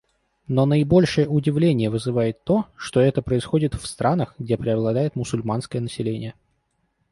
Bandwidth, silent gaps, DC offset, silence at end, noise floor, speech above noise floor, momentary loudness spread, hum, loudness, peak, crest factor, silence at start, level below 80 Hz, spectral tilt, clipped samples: 11.5 kHz; none; under 0.1%; 0.8 s; -70 dBFS; 49 dB; 9 LU; none; -22 LUFS; -6 dBFS; 16 dB; 0.5 s; -46 dBFS; -7 dB/octave; under 0.1%